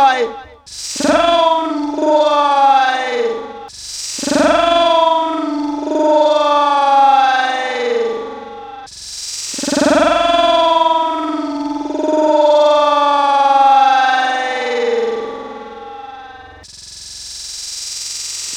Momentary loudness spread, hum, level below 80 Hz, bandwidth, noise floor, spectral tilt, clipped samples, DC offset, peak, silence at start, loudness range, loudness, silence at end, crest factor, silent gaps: 19 LU; none; -50 dBFS; 16 kHz; -36 dBFS; -2 dB/octave; under 0.1%; under 0.1%; 0 dBFS; 0 s; 7 LU; -14 LUFS; 0 s; 14 dB; none